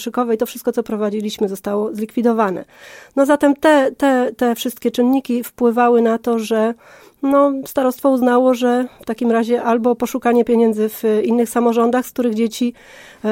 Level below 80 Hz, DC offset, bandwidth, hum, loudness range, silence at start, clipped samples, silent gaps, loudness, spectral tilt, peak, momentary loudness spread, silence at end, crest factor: -58 dBFS; under 0.1%; 17 kHz; none; 2 LU; 0 s; under 0.1%; none; -17 LUFS; -5 dB/octave; -2 dBFS; 8 LU; 0 s; 14 dB